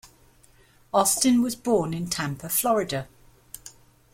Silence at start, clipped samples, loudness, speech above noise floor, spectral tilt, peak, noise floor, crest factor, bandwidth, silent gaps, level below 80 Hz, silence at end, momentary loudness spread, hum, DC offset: 0.05 s; under 0.1%; -24 LUFS; 33 dB; -4 dB/octave; -8 dBFS; -57 dBFS; 20 dB; 16.5 kHz; none; -56 dBFS; 0.45 s; 22 LU; none; under 0.1%